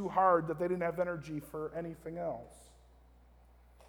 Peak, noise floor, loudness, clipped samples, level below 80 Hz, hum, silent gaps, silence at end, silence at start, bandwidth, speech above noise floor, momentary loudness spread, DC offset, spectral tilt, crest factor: -16 dBFS; -61 dBFS; -35 LUFS; under 0.1%; -62 dBFS; 60 Hz at -60 dBFS; none; 1.25 s; 0 s; 19.5 kHz; 27 dB; 14 LU; under 0.1%; -7.5 dB/octave; 20 dB